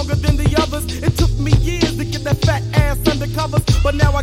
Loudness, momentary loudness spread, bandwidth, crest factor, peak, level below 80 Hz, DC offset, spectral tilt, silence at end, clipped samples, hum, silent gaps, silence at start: -17 LUFS; 4 LU; 16 kHz; 16 dB; 0 dBFS; -22 dBFS; under 0.1%; -6 dB/octave; 0 s; under 0.1%; none; none; 0 s